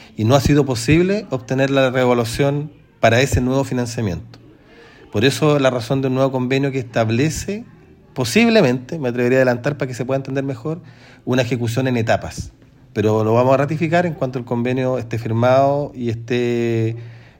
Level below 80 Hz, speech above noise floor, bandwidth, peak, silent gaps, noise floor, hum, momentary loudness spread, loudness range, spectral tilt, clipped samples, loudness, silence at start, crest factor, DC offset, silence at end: -42 dBFS; 27 dB; 16.5 kHz; 0 dBFS; none; -45 dBFS; none; 11 LU; 3 LU; -6 dB/octave; under 0.1%; -18 LUFS; 0 s; 18 dB; under 0.1%; 0.2 s